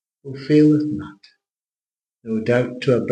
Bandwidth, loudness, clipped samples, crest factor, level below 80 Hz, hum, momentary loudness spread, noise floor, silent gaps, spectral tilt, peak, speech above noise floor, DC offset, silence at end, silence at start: 8.8 kHz; -19 LUFS; under 0.1%; 16 dB; -62 dBFS; none; 22 LU; under -90 dBFS; none; -8 dB/octave; -4 dBFS; over 71 dB; under 0.1%; 0 s; 0.25 s